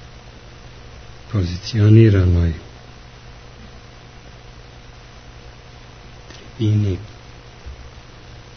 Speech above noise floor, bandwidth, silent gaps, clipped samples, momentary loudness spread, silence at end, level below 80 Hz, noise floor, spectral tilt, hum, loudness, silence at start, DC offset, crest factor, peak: 26 dB; 6.6 kHz; none; under 0.1%; 28 LU; 0.55 s; -38 dBFS; -40 dBFS; -8 dB/octave; none; -17 LUFS; 0.25 s; under 0.1%; 20 dB; 0 dBFS